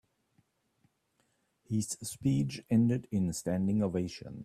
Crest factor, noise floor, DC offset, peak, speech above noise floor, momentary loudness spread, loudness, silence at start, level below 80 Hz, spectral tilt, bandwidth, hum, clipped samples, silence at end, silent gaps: 16 dB; -76 dBFS; under 0.1%; -18 dBFS; 45 dB; 8 LU; -32 LUFS; 1.7 s; -62 dBFS; -6.5 dB/octave; 14 kHz; none; under 0.1%; 0 s; none